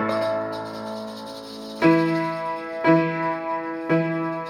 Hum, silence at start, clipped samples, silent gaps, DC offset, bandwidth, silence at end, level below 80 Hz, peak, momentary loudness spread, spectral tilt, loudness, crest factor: none; 0 s; under 0.1%; none; under 0.1%; 12.5 kHz; 0 s; -64 dBFS; -6 dBFS; 15 LU; -7 dB/octave; -23 LUFS; 18 dB